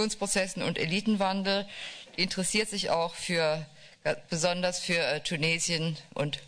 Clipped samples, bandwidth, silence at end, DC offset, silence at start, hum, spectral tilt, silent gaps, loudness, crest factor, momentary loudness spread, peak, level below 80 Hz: under 0.1%; 11 kHz; 0 s; under 0.1%; 0 s; none; -3.5 dB/octave; none; -29 LUFS; 14 dB; 7 LU; -16 dBFS; -58 dBFS